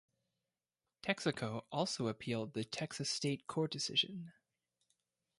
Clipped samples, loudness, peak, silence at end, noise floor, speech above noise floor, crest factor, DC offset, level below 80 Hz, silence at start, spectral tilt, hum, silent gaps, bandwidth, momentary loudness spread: under 0.1%; -38 LUFS; -18 dBFS; 1.1 s; under -90 dBFS; over 51 dB; 22 dB; under 0.1%; -76 dBFS; 1.05 s; -4 dB/octave; none; none; 11.5 kHz; 8 LU